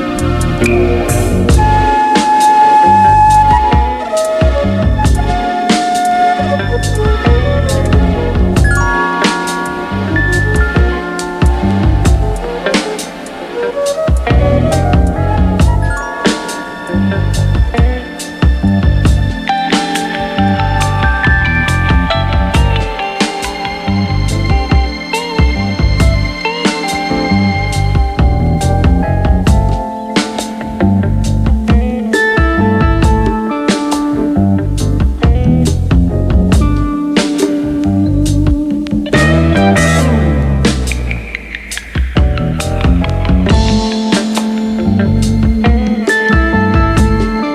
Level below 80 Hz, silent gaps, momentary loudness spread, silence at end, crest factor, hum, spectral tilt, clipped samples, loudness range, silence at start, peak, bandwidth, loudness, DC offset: -16 dBFS; none; 6 LU; 0 s; 10 dB; none; -6 dB/octave; under 0.1%; 5 LU; 0 s; 0 dBFS; 14 kHz; -12 LUFS; under 0.1%